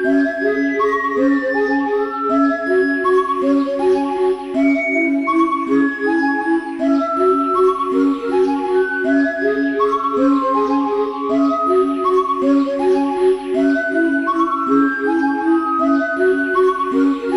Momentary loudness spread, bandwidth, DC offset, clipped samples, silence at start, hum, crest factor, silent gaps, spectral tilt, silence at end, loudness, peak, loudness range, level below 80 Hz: 2 LU; 11 kHz; under 0.1%; under 0.1%; 0 s; none; 12 dB; none; -5.5 dB/octave; 0 s; -17 LUFS; -4 dBFS; 0 LU; -54 dBFS